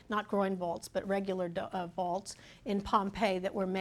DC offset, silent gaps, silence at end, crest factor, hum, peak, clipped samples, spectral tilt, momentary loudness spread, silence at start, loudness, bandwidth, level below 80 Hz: under 0.1%; none; 0 s; 20 dB; none; -14 dBFS; under 0.1%; -5.5 dB/octave; 7 LU; 0.1 s; -34 LUFS; 14 kHz; -60 dBFS